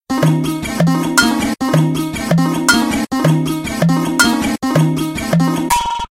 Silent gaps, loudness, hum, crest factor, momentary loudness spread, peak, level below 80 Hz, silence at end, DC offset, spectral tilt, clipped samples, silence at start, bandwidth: none; -15 LUFS; none; 14 dB; 4 LU; 0 dBFS; -38 dBFS; 0.05 s; 0.1%; -5 dB/octave; under 0.1%; 0.1 s; 16.5 kHz